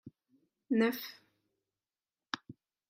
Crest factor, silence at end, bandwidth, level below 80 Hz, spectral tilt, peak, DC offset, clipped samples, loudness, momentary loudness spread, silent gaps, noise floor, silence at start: 24 dB; 0.35 s; 16 kHz; -86 dBFS; -5 dB/octave; -14 dBFS; under 0.1%; under 0.1%; -35 LUFS; 12 LU; none; under -90 dBFS; 0.05 s